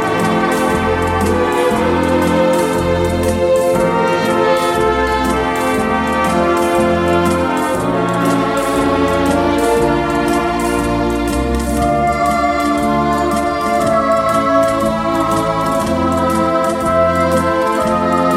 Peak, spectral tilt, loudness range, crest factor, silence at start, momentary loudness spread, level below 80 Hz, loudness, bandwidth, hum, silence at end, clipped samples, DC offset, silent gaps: 0 dBFS; -5.5 dB/octave; 1 LU; 14 dB; 0 s; 3 LU; -30 dBFS; -14 LUFS; 16.5 kHz; none; 0 s; under 0.1%; under 0.1%; none